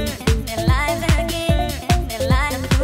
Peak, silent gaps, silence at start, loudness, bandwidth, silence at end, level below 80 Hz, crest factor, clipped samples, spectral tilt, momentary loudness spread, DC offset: -4 dBFS; none; 0 s; -20 LUFS; 16.5 kHz; 0 s; -24 dBFS; 16 dB; under 0.1%; -5 dB/octave; 2 LU; under 0.1%